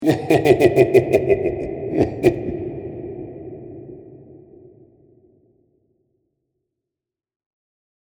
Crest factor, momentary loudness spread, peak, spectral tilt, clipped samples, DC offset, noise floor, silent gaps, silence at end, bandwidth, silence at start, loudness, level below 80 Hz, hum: 22 dB; 22 LU; 0 dBFS; -7.5 dB/octave; under 0.1%; under 0.1%; -87 dBFS; none; 3.8 s; 20 kHz; 0 s; -18 LUFS; -46 dBFS; none